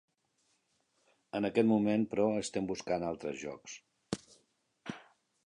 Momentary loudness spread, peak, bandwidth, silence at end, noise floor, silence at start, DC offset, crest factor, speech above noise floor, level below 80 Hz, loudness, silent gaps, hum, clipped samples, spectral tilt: 20 LU; -16 dBFS; 11 kHz; 0.45 s; -77 dBFS; 1.35 s; under 0.1%; 20 dB; 44 dB; -68 dBFS; -34 LUFS; none; none; under 0.1%; -5.5 dB/octave